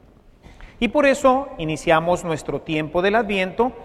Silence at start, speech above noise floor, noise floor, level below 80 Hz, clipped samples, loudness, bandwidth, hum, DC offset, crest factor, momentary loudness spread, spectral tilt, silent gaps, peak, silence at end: 0.6 s; 28 dB; -48 dBFS; -44 dBFS; under 0.1%; -20 LUFS; 13.5 kHz; none; under 0.1%; 20 dB; 9 LU; -5 dB/octave; none; -2 dBFS; 0 s